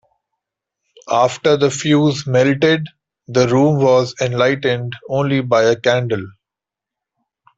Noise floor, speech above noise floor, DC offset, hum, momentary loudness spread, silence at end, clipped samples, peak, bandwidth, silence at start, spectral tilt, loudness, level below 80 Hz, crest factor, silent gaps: -86 dBFS; 71 dB; under 0.1%; none; 8 LU; 1.3 s; under 0.1%; -2 dBFS; 8 kHz; 1.05 s; -5.5 dB/octave; -16 LUFS; -56 dBFS; 14 dB; none